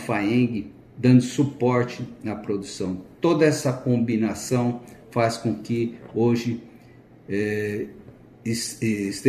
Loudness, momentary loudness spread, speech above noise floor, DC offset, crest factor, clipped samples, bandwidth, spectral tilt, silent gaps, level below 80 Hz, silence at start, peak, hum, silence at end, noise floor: -24 LUFS; 13 LU; 26 dB; under 0.1%; 20 dB; under 0.1%; 14.5 kHz; -6 dB/octave; none; -60 dBFS; 0 s; -4 dBFS; none; 0 s; -49 dBFS